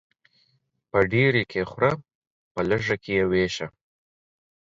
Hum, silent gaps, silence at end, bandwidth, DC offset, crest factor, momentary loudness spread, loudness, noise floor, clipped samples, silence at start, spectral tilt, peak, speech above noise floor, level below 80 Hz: none; 2.15-2.55 s; 1.1 s; 7.8 kHz; under 0.1%; 22 dB; 13 LU; -24 LUFS; -69 dBFS; under 0.1%; 0.95 s; -6 dB/octave; -6 dBFS; 46 dB; -52 dBFS